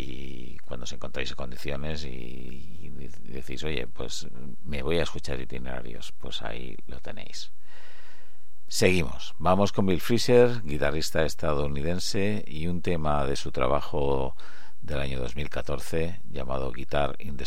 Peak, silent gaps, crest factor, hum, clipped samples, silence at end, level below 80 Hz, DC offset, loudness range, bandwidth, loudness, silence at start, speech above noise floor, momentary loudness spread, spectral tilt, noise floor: -6 dBFS; none; 24 dB; none; under 0.1%; 0 s; -42 dBFS; 7%; 12 LU; 16.5 kHz; -29 LUFS; 0 s; 30 dB; 18 LU; -5 dB/octave; -59 dBFS